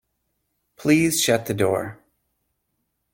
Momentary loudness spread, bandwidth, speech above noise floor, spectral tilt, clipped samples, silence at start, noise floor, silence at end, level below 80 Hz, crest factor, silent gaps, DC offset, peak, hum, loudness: 10 LU; 16.5 kHz; 55 dB; -4 dB/octave; under 0.1%; 0.8 s; -75 dBFS; 1.2 s; -60 dBFS; 20 dB; none; under 0.1%; -6 dBFS; none; -21 LUFS